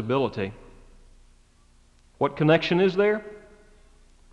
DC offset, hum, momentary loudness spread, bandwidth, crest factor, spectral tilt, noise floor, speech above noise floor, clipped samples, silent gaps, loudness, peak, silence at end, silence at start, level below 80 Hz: under 0.1%; 60 Hz at -55 dBFS; 13 LU; 8.8 kHz; 20 dB; -7.5 dB/octave; -57 dBFS; 35 dB; under 0.1%; none; -24 LUFS; -6 dBFS; 0.95 s; 0 s; -54 dBFS